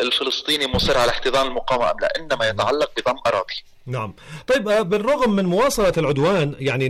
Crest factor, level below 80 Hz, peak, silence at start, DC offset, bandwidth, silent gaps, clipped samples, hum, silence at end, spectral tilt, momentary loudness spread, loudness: 10 dB; -40 dBFS; -10 dBFS; 0 s; under 0.1%; 15.5 kHz; none; under 0.1%; none; 0 s; -4.5 dB/octave; 11 LU; -20 LUFS